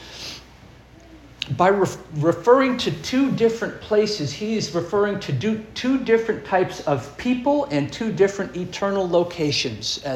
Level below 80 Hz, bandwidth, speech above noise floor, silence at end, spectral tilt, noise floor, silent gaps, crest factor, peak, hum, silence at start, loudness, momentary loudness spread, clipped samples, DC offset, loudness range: -52 dBFS; 16 kHz; 25 dB; 0 s; -5 dB/octave; -46 dBFS; none; 18 dB; -4 dBFS; none; 0 s; -22 LUFS; 8 LU; under 0.1%; under 0.1%; 2 LU